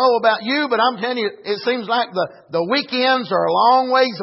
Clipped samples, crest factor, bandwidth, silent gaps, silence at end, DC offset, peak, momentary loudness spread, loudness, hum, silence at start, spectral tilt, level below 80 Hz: under 0.1%; 14 dB; 5.8 kHz; none; 0 s; under 0.1%; -4 dBFS; 9 LU; -18 LUFS; none; 0 s; -7.5 dB/octave; -72 dBFS